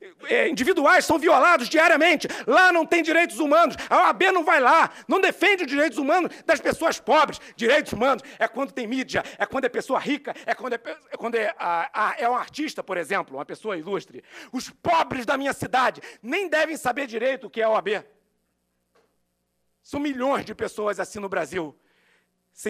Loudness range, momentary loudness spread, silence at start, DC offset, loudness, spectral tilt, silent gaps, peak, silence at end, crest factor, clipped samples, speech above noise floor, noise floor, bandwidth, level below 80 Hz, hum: 11 LU; 13 LU; 0 s; under 0.1%; -22 LUFS; -3.5 dB/octave; none; -6 dBFS; 0 s; 18 dB; under 0.1%; 51 dB; -74 dBFS; 15.5 kHz; -62 dBFS; none